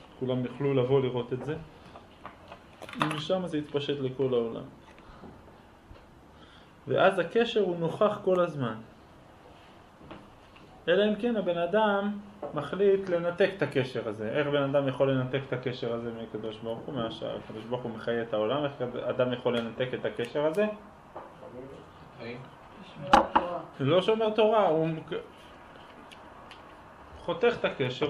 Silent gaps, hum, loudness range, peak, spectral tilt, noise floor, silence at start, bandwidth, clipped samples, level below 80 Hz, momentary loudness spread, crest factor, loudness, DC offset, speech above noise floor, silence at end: none; none; 7 LU; -6 dBFS; -6.5 dB/octave; -53 dBFS; 0 s; 11.5 kHz; under 0.1%; -60 dBFS; 24 LU; 24 dB; -29 LUFS; under 0.1%; 25 dB; 0 s